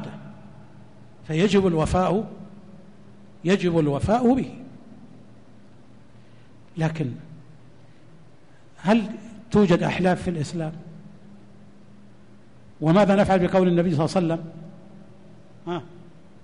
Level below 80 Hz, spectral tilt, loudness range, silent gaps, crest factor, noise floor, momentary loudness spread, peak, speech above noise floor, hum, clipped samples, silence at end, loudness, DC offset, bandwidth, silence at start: -48 dBFS; -7 dB/octave; 12 LU; none; 14 dB; -53 dBFS; 23 LU; -10 dBFS; 32 dB; none; under 0.1%; 0.6 s; -22 LUFS; 0.4%; 10.5 kHz; 0 s